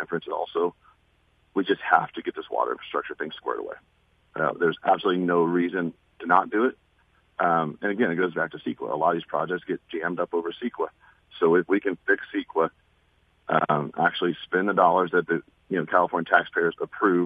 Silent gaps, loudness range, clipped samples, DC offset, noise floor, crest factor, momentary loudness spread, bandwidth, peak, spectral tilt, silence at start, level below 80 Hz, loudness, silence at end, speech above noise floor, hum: none; 4 LU; under 0.1%; under 0.1%; -64 dBFS; 22 dB; 10 LU; 4.9 kHz; -2 dBFS; -8.5 dB/octave; 0 s; -68 dBFS; -25 LUFS; 0 s; 40 dB; none